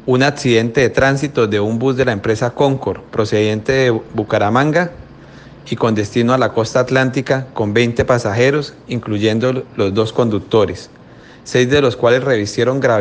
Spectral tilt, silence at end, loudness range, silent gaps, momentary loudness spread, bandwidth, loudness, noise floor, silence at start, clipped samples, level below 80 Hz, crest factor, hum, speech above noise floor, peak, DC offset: -6 dB/octave; 0 s; 2 LU; none; 7 LU; 9.6 kHz; -15 LUFS; -40 dBFS; 0.05 s; under 0.1%; -46 dBFS; 16 dB; none; 25 dB; 0 dBFS; under 0.1%